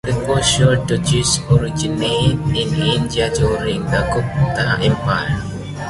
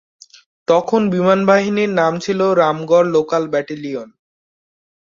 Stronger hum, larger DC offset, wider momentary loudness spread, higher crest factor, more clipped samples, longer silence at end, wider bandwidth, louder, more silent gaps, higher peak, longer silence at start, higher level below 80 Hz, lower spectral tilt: neither; neither; second, 5 LU vs 12 LU; about the same, 14 dB vs 16 dB; neither; second, 0 s vs 1.1 s; first, 11.5 kHz vs 7.4 kHz; about the same, -17 LUFS vs -16 LUFS; neither; about the same, -2 dBFS vs -2 dBFS; second, 0.05 s vs 0.7 s; first, -32 dBFS vs -60 dBFS; second, -4.5 dB/octave vs -6 dB/octave